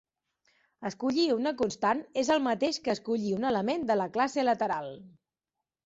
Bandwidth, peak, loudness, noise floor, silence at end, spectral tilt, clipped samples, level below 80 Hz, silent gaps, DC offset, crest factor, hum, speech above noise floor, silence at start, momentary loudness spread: 8 kHz; -14 dBFS; -29 LUFS; -89 dBFS; 0.75 s; -4.5 dB/octave; under 0.1%; -68 dBFS; none; under 0.1%; 16 dB; none; 60 dB; 0.8 s; 8 LU